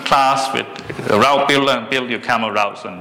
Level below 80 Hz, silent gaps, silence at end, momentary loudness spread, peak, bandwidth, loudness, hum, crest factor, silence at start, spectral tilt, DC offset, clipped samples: -52 dBFS; none; 0 s; 9 LU; -4 dBFS; 19 kHz; -16 LUFS; none; 12 dB; 0 s; -3.5 dB/octave; under 0.1%; under 0.1%